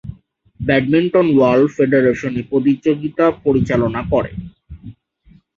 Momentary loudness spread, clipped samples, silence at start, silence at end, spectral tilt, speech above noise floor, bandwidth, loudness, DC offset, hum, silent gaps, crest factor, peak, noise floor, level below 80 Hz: 12 LU; under 0.1%; 0.05 s; 0.65 s; -8 dB/octave; 36 dB; 7.2 kHz; -16 LUFS; under 0.1%; none; none; 16 dB; 0 dBFS; -50 dBFS; -42 dBFS